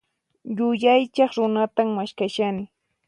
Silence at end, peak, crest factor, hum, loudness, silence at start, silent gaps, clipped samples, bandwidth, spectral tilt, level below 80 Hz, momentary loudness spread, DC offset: 0.4 s; -6 dBFS; 16 dB; none; -22 LUFS; 0.45 s; none; under 0.1%; 10.5 kHz; -6 dB/octave; -68 dBFS; 14 LU; under 0.1%